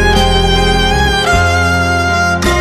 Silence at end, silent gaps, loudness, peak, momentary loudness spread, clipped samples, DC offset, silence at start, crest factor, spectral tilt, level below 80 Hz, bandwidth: 0 s; none; -11 LUFS; 0 dBFS; 1 LU; under 0.1%; under 0.1%; 0 s; 10 dB; -4.5 dB/octave; -18 dBFS; 14.5 kHz